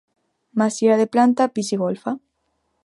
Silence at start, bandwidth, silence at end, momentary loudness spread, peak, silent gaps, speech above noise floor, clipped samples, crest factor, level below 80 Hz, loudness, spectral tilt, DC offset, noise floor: 0.55 s; 11.5 kHz; 0.65 s; 12 LU; -4 dBFS; none; 52 dB; under 0.1%; 18 dB; -72 dBFS; -20 LUFS; -5.5 dB/octave; under 0.1%; -71 dBFS